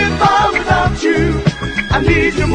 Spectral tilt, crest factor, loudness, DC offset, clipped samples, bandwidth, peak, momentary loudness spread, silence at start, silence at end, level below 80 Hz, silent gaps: -5.5 dB/octave; 14 dB; -13 LUFS; under 0.1%; under 0.1%; 10.5 kHz; 0 dBFS; 5 LU; 0 s; 0 s; -26 dBFS; none